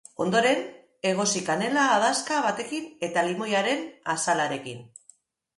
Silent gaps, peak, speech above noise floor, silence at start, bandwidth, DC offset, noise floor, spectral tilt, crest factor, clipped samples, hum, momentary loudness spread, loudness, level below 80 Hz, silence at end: none; -10 dBFS; 34 dB; 0.2 s; 11.5 kHz; under 0.1%; -59 dBFS; -3 dB/octave; 16 dB; under 0.1%; none; 10 LU; -25 LUFS; -72 dBFS; 0.7 s